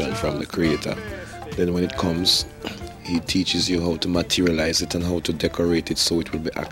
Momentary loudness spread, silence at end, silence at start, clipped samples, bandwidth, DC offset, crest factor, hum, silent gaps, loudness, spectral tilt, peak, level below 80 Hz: 12 LU; 0 s; 0 s; under 0.1%; 16.5 kHz; under 0.1%; 16 dB; none; none; -22 LUFS; -4 dB/octave; -6 dBFS; -42 dBFS